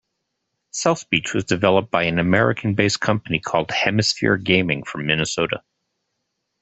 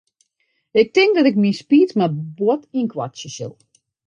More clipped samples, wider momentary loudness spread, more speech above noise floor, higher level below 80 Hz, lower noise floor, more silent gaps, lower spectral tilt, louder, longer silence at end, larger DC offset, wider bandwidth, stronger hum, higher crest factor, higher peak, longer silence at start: neither; second, 6 LU vs 16 LU; first, 57 dB vs 52 dB; first, -52 dBFS vs -68 dBFS; first, -76 dBFS vs -70 dBFS; neither; second, -4.5 dB/octave vs -6 dB/octave; about the same, -20 LUFS vs -18 LUFS; first, 1.05 s vs 0.55 s; neither; about the same, 8.4 kHz vs 9.2 kHz; neither; about the same, 20 dB vs 16 dB; about the same, -2 dBFS vs -2 dBFS; about the same, 0.75 s vs 0.75 s